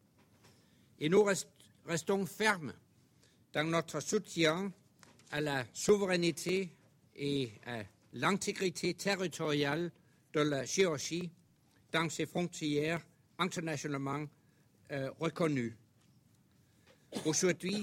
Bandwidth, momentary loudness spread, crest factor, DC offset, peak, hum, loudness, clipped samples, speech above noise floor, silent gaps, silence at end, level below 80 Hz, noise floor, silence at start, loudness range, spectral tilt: 16.5 kHz; 12 LU; 22 dB; under 0.1%; -14 dBFS; none; -35 LUFS; under 0.1%; 34 dB; none; 0 s; -72 dBFS; -68 dBFS; 1 s; 4 LU; -4 dB/octave